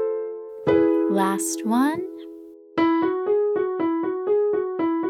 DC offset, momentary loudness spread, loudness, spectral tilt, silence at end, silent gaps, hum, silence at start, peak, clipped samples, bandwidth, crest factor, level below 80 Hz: under 0.1%; 11 LU; -22 LUFS; -5 dB/octave; 0 s; none; none; 0 s; -8 dBFS; under 0.1%; 15 kHz; 14 dB; -62 dBFS